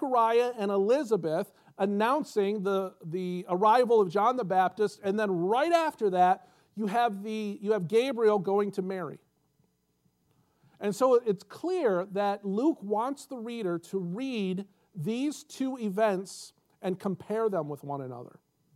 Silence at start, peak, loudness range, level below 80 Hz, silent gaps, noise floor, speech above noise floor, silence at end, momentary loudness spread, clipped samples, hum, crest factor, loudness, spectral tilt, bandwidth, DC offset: 0 s; -12 dBFS; 6 LU; -84 dBFS; none; -73 dBFS; 44 dB; 0.45 s; 13 LU; under 0.1%; none; 18 dB; -29 LUFS; -6 dB/octave; 14.5 kHz; under 0.1%